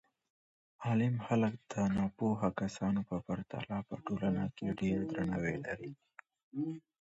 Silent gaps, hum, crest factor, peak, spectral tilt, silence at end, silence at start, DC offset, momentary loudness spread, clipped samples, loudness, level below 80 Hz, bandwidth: 6.43-6.52 s; none; 18 dB; -20 dBFS; -7.5 dB/octave; 0.2 s; 0.8 s; under 0.1%; 9 LU; under 0.1%; -36 LUFS; -60 dBFS; 7.6 kHz